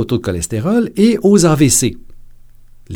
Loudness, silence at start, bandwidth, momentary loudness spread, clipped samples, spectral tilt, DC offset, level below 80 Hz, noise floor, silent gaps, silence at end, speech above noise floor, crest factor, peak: -13 LUFS; 0 s; 20 kHz; 9 LU; under 0.1%; -5 dB/octave; under 0.1%; -38 dBFS; -39 dBFS; none; 0 s; 26 dB; 14 dB; 0 dBFS